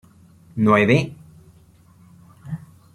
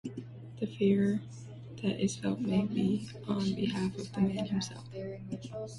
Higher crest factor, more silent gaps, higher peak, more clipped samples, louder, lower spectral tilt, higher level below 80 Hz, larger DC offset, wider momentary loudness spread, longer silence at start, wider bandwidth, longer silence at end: about the same, 20 dB vs 18 dB; neither; first, -2 dBFS vs -16 dBFS; neither; first, -18 LUFS vs -33 LUFS; about the same, -7.5 dB/octave vs -6.5 dB/octave; first, -56 dBFS vs -62 dBFS; neither; first, 20 LU vs 14 LU; first, 0.55 s vs 0.05 s; about the same, 12 kHz vs 11.5 kHz; first, 0.35 s vs 0 s